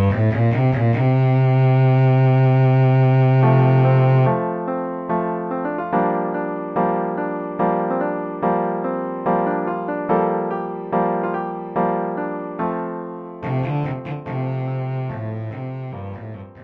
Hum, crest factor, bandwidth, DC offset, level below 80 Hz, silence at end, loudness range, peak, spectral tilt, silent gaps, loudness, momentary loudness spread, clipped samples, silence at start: none; 14 dB; 4.3 kHz; under 0.1%; -54 dBFS; 0 s; 10 LU; -4 dBFS; -11 dB/octave; none; -20 LUFS; 13 LU; under 0.1%; 0 s